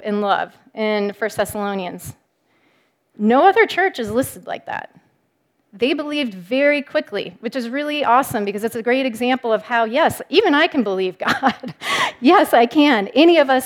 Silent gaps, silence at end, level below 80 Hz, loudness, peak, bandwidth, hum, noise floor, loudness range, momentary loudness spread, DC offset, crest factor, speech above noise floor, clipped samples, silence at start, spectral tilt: none; 0 s; -58 dBFS; -18 LUFS; 0 dBFS; 18.5 kHz; none; -66 dBFS; 6 LU; 14 LU; under 0.1%; 18 dB; 48 dB; under 0.1%; 0 s; -4.5 dB/octave